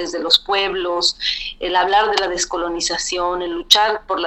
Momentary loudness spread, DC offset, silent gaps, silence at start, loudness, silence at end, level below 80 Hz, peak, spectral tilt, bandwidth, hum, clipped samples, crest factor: 8 LU; under 0.1%; none; 0 s; -17 LUFS; 0 s; -44 dBFS; 0 dBFS; -0.5 dB/octave; 16 kHz; none; under 0.1%; 18 dB